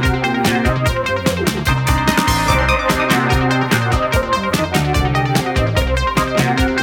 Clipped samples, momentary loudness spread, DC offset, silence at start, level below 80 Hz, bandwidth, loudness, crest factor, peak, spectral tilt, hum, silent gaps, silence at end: under 0.1%; 3 LU; under 0.1%; 0 s; -24 dBFS; 18.5 kHz; -16 LUFS; 16 dB; 0 dBFS; -5 dB/octave; none; none; 0 s